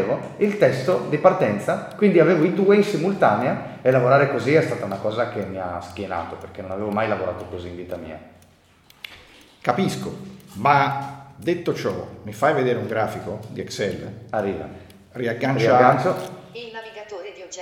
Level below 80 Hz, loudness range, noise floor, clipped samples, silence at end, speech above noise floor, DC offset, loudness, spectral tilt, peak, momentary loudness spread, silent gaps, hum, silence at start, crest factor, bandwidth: -58 dBFS; 11 LU; -54 dBFS; under 0.1%; 0 s; 33 dB; under 0.1%; -21 LUFS; -6.5 dB/octave; 0 dBFS; 19 LU; none; none; 0 s; 22 dB; 16.5 kHz